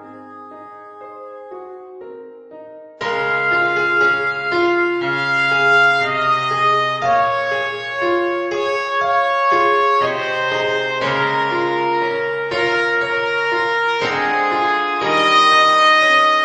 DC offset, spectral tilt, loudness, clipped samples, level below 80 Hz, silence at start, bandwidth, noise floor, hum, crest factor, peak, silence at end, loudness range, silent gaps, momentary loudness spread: under 0.1%; -4 dB/octave; -16 LUFS; under 0.1%; -60 dBFS; 0 s; 9.8 kHz; -37 dBFS; none; 16 dB; -2 dBFS; 0 s; 4 LU; none; 23 LU